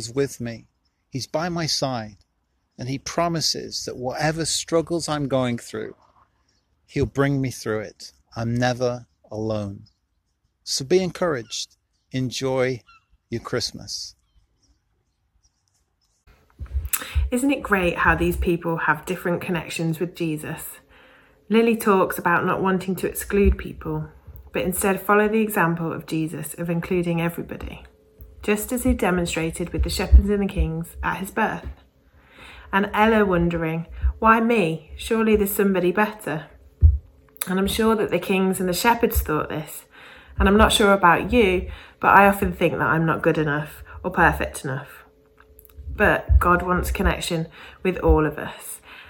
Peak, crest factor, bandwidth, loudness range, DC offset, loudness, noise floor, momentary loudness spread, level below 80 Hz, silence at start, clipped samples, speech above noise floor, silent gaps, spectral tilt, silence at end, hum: -2 dBFS; 22 dB; 17.5 kHz; 8 LU; under 0.1%; -22 LUFS; -71 dBFS; 15 LU; -32 dBFS; 0 s; under 0.1%; 50 dB; none; -5 dB/octave; 0.05 s; none